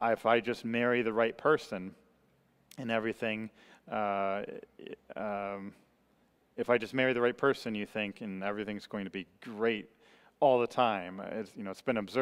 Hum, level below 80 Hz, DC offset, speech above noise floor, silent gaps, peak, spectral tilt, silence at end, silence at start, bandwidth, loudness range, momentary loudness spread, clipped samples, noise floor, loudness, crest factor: none; -74 dBFS; under 0.1%; 37 dB; none; -12 dBFS; -6 dB/octave; 0 s; 0 s; 15 kHz; 4 LU; 16 LU; under 0.1%; -70 dBFS; -33 LUFS; 22 dB